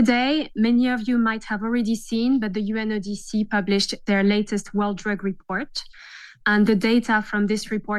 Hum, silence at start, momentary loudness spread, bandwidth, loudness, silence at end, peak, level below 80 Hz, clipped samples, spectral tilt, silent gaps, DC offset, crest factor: none; 0 s; 9 LU; 12.5 kHz; -22 LUFS; 0 s; -6 dBFS; -48 dBFS; under 0.1%; -5 dB/octave; none; under 0.1%; 16 dB